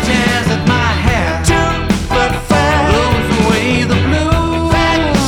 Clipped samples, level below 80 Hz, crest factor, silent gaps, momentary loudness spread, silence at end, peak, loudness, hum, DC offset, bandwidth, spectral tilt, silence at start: under 0.1%; -24 dBFS; 12 dB; none; 2 LU; 0 s; 0 dBFS; -13 LUFS; none; under 0.1%; 17 kHz; -5 dB/octave; 0 s